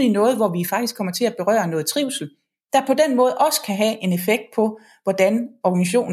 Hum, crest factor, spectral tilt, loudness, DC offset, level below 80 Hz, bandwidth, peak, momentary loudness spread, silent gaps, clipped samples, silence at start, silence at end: none; 18 dB; -4.5 dB/octave; -20 LUFS; under 0.1%; -76 dBFS; 16 kHz; -2 dBFS; 7 LU; none; under 0.1%; 0 s; 0 s